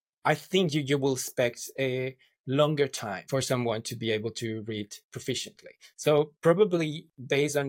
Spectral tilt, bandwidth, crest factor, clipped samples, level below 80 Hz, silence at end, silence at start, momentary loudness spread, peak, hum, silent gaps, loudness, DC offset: -5 dB/octave; 17 kHz; 18 dB; under 0.1%; -72 dBFS; 0 s; 0.25 s; 12 LU; -10 dBFS; none; 2.40-2.44 s, 5.04-5.09 s; -28 LUFS; under 0.1%